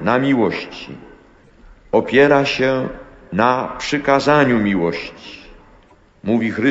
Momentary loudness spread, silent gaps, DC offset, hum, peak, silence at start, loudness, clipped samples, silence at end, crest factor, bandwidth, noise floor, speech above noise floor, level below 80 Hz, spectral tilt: 18 LU; none; under 0.1%; none; -2 dBFS; 0 s; -17 LUFS; under 0.1%; 0 s; 16 dB; 8 kHz; -50 dBFS; 33 dB; -46 dBFS; -6 dB/octave